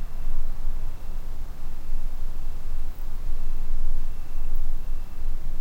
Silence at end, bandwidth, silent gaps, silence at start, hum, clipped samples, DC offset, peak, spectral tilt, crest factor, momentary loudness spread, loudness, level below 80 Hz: 0 s; 1.4 kHz; none; 0 s; none; under 0.1%; under 0.1%; -8 dBFS; -6.5 dB/octave; 10 dB; 6 LU; -36 LUFS; -24 dBFS